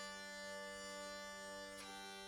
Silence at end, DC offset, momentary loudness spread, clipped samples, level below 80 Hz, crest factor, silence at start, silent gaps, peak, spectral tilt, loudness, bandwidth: 0 s; under 0.1%; 2 LU; under 0.1%; -76 dBFS; 12 dB; 0 s; none; -38 dBFS; -2 dB/octave; -50 LUFS; 18 kHz